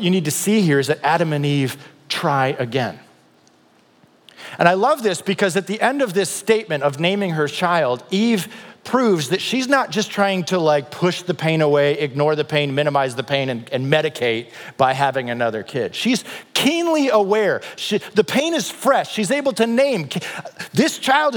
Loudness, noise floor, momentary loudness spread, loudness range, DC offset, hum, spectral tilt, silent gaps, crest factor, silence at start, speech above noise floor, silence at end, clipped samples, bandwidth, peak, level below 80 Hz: -19 LUFS; -55 dBFS; 7 LU; 3 LU; under 0.1%; none; -4.5 dB/octave; none; 18 dB; 0 s; 36 dB; 0 s; under 0.1%; 19.5 kHz; 0 dBFS; -74 dBFS